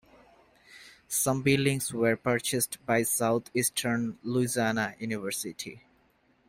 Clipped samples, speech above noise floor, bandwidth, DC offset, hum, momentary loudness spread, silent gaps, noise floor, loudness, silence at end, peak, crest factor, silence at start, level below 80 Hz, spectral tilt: under 0.1%; 38 dB; 16 kHz; under 0.1%; none; 9 LU; none; -67 dBFS; -28 LUFS; 0.7 s; -10 dBFS; 20 dB; 0.7 s; -62 dBFS; -4 dB/octave